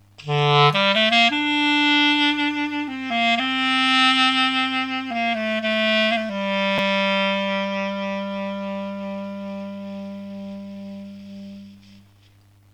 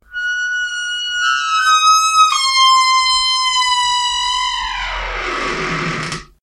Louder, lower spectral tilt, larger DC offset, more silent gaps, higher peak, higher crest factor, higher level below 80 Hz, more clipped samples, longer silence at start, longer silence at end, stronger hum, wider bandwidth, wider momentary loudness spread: second, -19 LUFS vs -14 LUFS; first, -4.5 dB/octave vs -0.5 dB/octave; neither; neither; about the same, 0 dBFS vs 0 dBFS; first, 22 dB vs 14 dB; second, -66 dBFS vs -38 dBFS; neither; about the same, 0.2 s vs 0.1 s; first, 0.75 s vs 0.2 s; first, 50 Hz at -55 dBFS vs none; second, 13 kHz vs 14.5 kHz; first, 19 LU vs 11 LU